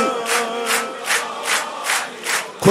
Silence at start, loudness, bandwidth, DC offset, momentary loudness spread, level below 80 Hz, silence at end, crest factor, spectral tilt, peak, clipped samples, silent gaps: 0 s; -20 LUFS; 16 kHz; under 0.1%; 3 LU; -58 dBFS; 0 s; 20 dB; -2.5 dB/octave; 0 dBFS; under 0.1%; none